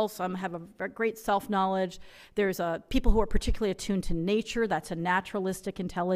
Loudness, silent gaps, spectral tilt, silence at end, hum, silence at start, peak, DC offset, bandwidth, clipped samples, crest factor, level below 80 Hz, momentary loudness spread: -30 LUFS; none; -5.5 dB/octave; 0 s; none; 0 s; -8 dBFS; under 0.1%; 16 kHz; under 0.1%; 20 dB; -36 dBFS; 8 LU